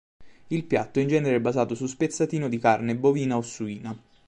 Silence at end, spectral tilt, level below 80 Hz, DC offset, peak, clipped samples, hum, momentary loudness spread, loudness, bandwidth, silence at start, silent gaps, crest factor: 0.3 s; -6.5 dB/octave; -64 dBFS; under 0.1%; -8 dBFS; under 0.1%; none; 11 LU; -25 LUFS; 10.5 kHz; 0.2 s; none; 18 dB